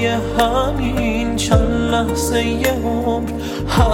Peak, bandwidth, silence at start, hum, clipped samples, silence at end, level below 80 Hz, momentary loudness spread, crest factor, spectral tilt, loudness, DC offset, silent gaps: -2 dBFS; 17 kHz; 0 s; none; under 0.1%; 0 s; -24 dBFS; 4 LU; 14 dB; -5.5 dB/octave; -18 LUFS; under 0.1%; none